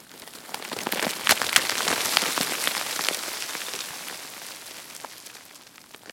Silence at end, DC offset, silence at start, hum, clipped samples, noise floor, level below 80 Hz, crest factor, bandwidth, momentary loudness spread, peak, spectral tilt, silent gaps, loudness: 0 s; under 0.1%; 0 s; none; under 0.1%; -48 dBFS; -70 dBFS; 30 dB; 17 kHz; 21 LU; 0 dBFS; 0 dB/octave; none; -25 LUFS